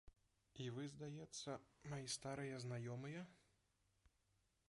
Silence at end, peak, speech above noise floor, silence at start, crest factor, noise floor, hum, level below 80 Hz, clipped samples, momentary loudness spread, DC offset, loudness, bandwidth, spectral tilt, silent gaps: 0.65 s; -34 dBFS; 33 dB; 0.05 s; 18 dB; -84 dBFS; none; -78 dBFS; under 0.1%; 7 LU; under 0.1%; -51 LUFS; 11.5 kHz; -4.5 dB/octave; none